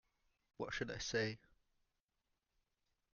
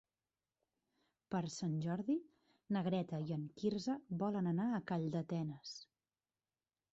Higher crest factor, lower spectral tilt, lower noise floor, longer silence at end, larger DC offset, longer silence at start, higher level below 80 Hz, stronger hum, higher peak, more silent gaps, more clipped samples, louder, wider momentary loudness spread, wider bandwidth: first, 24 dB vs 16 dB; second, -3 dB/octave vs -7 dB/octave; about the same, -88 dBFS vs under -90 dBFS; first, 1.75 s vs 1.1 s; neither; second, 0.6 s vs 1.3 s; first, -68 dBFS vs -78 dBFS; neither; about the same, -24 dBFS vs -26 dBFS; neither; neither; about the same, -43 LUFS vs -41 LUFS; first, 10 LU vs 6 LU; second, 7 kHz vs 8 kHz